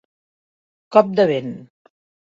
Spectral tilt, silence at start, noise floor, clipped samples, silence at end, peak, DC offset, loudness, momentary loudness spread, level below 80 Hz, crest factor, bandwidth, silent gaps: -7.5 dB/octave; 0.9 s; under -90 dBFS; under 0.1%; 0.7 s; 0 dBFS; under 0.1%; -17 LUFS; 18 LU; -66 dBFS; 20 dB; 7.6 kHz; none